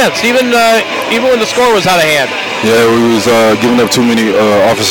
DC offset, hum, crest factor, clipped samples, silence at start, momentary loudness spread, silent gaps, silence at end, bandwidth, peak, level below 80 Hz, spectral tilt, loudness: under 0.1%; none; 8 dB; under 0.1%; 0 s; 3 LU; none; 0 s; 17.5 kHz; -2 dBFS; -44 dBFS; -3.5 dB/octave; -9 LUFS